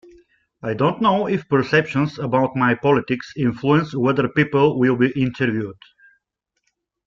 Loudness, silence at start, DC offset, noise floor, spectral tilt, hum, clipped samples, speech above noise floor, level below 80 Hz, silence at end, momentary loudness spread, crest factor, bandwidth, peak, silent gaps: -19 LUFS; 0.65 s; under 0.1%; -75 dBFS; -8 dB/octave; none; under 0.1%; 57 dB; -56 dBFS; 1.35 s; 6 LU; 18 dB; 7.4 kHz; -2 dBFS; none